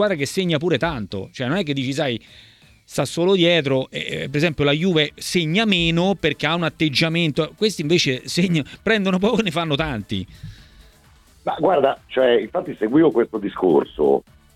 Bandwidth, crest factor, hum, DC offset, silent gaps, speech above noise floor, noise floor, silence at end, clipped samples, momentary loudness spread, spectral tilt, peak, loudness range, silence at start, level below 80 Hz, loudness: 15 kHz; 18 dB; none; under 0.1%; none; 32 dB; -52 dBFS; 0.35 s; under 0.1%; 9 LU; -5.5 dB/octave; -2 dBFS; 4 LU; 0 s; -48 dBFS; -20 LUFS